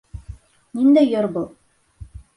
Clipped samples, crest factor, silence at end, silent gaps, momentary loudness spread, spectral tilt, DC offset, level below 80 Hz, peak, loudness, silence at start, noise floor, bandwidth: under 0.1%; 16 dB; 0.15 s; none; 23 LU; -8 dB/octave; under 0.1%; -44 dBFS; -6 dBFS; -18 LUFS; 0.15 s; -43 dBFS; 10.5 kHz